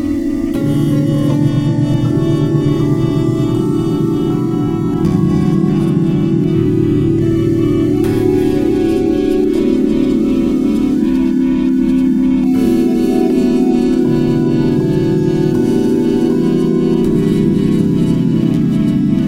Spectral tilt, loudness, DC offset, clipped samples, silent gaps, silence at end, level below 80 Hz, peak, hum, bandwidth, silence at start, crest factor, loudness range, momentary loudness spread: -8.5 dB/octave; -13 LUFS; under 0.1%; under 0.1%; none; 0 s; -34 dBFS; 0 dBFS; none; 15.5 kHz; 0 s; 12 dB; 1 LU; 2 LU